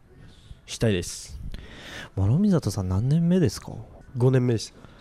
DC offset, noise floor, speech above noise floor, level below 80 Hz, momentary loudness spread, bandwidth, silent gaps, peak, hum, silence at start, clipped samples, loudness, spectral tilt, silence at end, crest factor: under 0.1%; -49 dBFS; 26 dB; -46 dBFS; 19 LU; 14.5 kHz; none; -10 dBFS; none; 0.2 s; under 0.1%; -24 LUFS; -6.5 dB/octave; 0.2 s; 16 dB